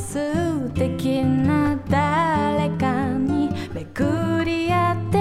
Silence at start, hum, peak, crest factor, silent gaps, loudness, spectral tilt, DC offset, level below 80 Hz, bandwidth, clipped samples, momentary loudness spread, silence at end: 0 s; none; -6 dBFS; 14 dB; none; -22 LUFS; -7 dB/octave; under 0.1%; -44 dBFS; 14.5 kHz; under 0.1%; 5 LU; 0 s